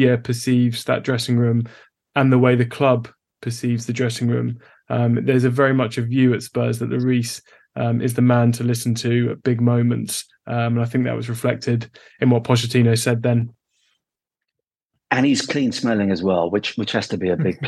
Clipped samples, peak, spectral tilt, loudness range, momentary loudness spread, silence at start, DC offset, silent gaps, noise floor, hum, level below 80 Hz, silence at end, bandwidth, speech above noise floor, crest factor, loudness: under 0.1%; -2 dBFS; -6 dB/octave; 2 LU; 9 LU; 0 s; under 0.1%; 14.85-14.90 s; -85 dBFS; none; -60 dBFS; 0 s; 12.5 kHz; 66 dB; 18 dB; -20 LUFS